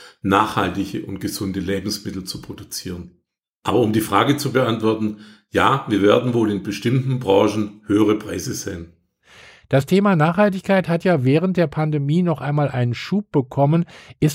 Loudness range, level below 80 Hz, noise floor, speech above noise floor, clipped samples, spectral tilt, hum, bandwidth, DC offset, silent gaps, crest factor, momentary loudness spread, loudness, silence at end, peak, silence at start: 5 LU; -52 dBFS; -49 dBFS; 30 dB; under 0.1%; -6.5 dB/octave; none; 16 kHz; under 0.1%; 3.49-3.62 s; 18 dB; 12 LU; -20 LUFS; 0 s; -2 dBFS; 0 s